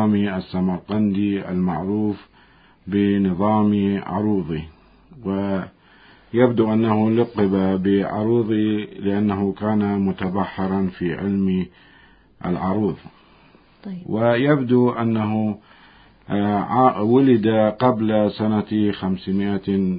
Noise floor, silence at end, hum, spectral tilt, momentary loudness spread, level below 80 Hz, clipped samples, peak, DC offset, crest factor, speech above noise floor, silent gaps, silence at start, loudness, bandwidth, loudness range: -52 dBFS; 0 s; none; -12.5 dB/octave; 10 LU; -48 dBFS; under 0.1%; -2 dBFS; under 0.1%; 18 dB; 33 dB; none; 0 s; -20 LUFS; 5 kHz; 5 LU